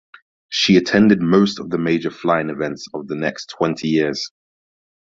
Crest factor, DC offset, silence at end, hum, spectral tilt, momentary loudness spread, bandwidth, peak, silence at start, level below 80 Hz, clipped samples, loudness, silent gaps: 18 dB; under 0.1%; 0.85 s; none; -5.5 dB/octave; 12 LU; 7.8 kHz; -2 dBFS; 0.5 s; -56 dBFS; under 0.1%; -18 LUFS; none